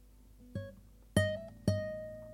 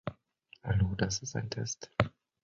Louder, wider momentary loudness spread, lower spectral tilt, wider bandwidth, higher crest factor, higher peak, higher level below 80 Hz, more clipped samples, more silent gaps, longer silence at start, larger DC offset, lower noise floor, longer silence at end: second, -37 LUFS vs -34 LUFS; first, 13 LU vs 8 LU; about the same, -6 dB/octave vs -5 dB/octave; first, 15.5 kHz vs 7.6 kHz; about the same, 24 dB vs 28 dB; second, -14 dBFS vs -6 dBFS; second, -56 dBFS vs -48 dBFS; neither; neither; about the same, 0 s vs 0.05 s; neither; second, -58 dBFS vs -62 dBFS; second, 0 s vs 0.35 s